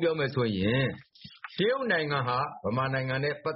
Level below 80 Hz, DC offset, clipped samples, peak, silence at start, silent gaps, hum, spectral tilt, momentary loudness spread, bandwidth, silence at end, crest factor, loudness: -60 dBFS; under 0.1%; under 0.1%; -14 dBFS; 0 s; none; none; -4.5 dB/octave; 6 LU; 5.8 kHz; 0 s; 16 dB; -29 LUFS